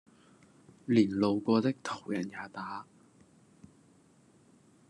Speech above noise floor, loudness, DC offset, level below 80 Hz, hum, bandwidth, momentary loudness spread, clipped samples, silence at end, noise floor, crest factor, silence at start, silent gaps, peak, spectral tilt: 33 dB; -31 LUFS; under 0.1%; -80 dBFS; none; 10.5 kHz; 15 LU; under 0.1%; 2.1 s; -63 dBFS; 22 dB; 0.9 s; none; -12 dBFS; -6.5 dB/octave